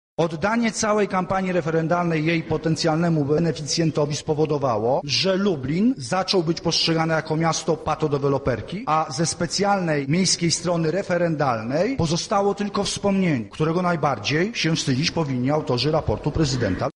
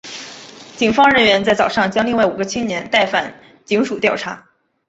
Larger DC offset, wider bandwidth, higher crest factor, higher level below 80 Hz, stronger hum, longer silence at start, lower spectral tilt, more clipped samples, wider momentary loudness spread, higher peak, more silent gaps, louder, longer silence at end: neither; first, 11.5 kHz vs 8.2 kHz; about the same, 14 dB vs 18 dB; first, -46 dBFS vs -52 dBFS; neither; first, 0.2 s vs 0.05 s; about the same, -5 dB/octave vs -4 dB/octave; neither; second, 3 LU vs 19 LU; second, -8 dBFS vs 0 dBFS; neither; second, -22 LUFS vs -16 LUFS; second, 0.05 s vs 0.5 s